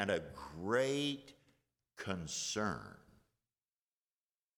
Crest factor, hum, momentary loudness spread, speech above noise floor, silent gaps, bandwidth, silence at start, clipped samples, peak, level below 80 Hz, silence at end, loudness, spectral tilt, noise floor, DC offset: 20 dB; none; 14 LU; over 51 dB; none; 19 kHz; 0 s; under 0.1%; -20 dBFS; -68 dBFS; 1.6 s; -39 LUFS; -3.5 dB/octave; under -90 dBFS; under 0.1%